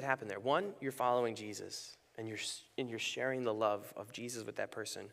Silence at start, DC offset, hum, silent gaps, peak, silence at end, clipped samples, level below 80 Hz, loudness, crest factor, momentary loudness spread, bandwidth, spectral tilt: 0 s; under 0.1%; none; none; -16 dBFS; 0 s; under 0.1%; -84 dBFS; -39 LUFS; 22 dB; 11 LU; 15.5 kHz; -3.5 dB/octave